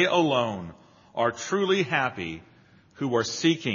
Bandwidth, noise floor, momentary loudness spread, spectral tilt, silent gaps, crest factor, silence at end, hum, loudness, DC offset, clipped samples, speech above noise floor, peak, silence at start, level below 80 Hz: 7.4 kHz; -55 dBFS; 14 LU; -3.5 dB/octave; none; 18 dB; 0 s; none; -26 LUFS; under 0.1%; under 0.1%; 29 dB; -8 dBFS; 0 s; -64 dBFS